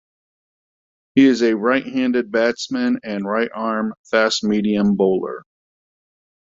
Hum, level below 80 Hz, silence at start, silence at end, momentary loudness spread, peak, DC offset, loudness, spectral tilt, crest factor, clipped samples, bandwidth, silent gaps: none; -60 dBFS; 1.15 s; 1.1 s; 8 LU; -2 dBFS; under 0.1%; -19 LUFS; -5 dB/octave; 18 dB; under 0.1%; 7.8 kHz; 3.97-4.04 s